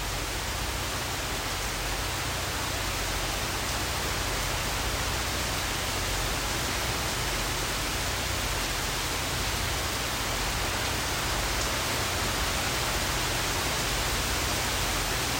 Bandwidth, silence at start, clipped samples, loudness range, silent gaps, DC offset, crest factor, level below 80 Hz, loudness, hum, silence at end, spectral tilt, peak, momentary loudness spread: 16.5 kHz; 0 s; under 0.1%; 2 LU; none; under 0.1%; 14 dB; -38 dBFS; -28 LUFS; none; 0 s; -2.5 dB/octave; -16 dBFS; 3 LU